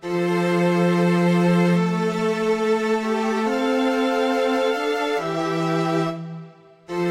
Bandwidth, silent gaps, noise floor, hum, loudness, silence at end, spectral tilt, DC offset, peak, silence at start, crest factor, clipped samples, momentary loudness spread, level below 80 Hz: 13 kHz; none; -43 dBFS; none; -21 LUFS; 0 s; -6.5 dB/octave; under 0.1%; -8 dBFS; 0 s; 12 dB; under 0.1%; 6 LU; -64 dBFS